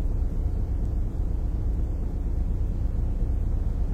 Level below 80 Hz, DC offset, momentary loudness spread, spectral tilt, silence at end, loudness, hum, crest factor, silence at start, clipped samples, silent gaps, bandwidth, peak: -26 dBFS; under 0.1%; 1 LU; -9.5 dB/octave; 0 s; -30 LUFS; none; 10 dB; 0 s; under 0.1%; none; 2.4 kHz; -16 dBFS